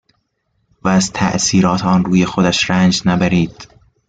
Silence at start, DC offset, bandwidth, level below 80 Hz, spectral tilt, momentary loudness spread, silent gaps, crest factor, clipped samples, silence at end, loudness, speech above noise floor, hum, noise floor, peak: 0.85 s; under 0.1%; 9.2 kHz; -44 dBFS; -4.5 dB/octave; 4 LU; none; 14 dB; under 0.1%; 0.45 s; -14 LUFS; 52 dB; none; -66 dBFS; -2 dBFS